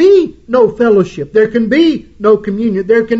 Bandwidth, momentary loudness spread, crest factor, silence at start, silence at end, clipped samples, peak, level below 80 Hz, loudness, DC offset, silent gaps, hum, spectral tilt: 7.8 kHz; 5 LU; 10 dB; 0 s; 0 s; under 0.1%; 0 dBFS; -44 dBFS; -12 LUFS; under 0.1%; none; none; -7 dB/octave